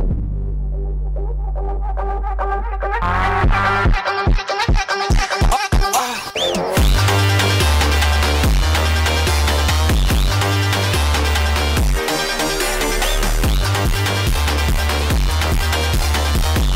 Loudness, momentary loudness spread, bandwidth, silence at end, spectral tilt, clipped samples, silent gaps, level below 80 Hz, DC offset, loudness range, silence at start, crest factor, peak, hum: -18 LUFS; 8 LU; 16.5 kHz; 0 s; -4 dB/octave; under 0.1%; none; -20 dBFS; under 0.1%; 3 LU; 0 s; 10 dB; -6 dBFS; none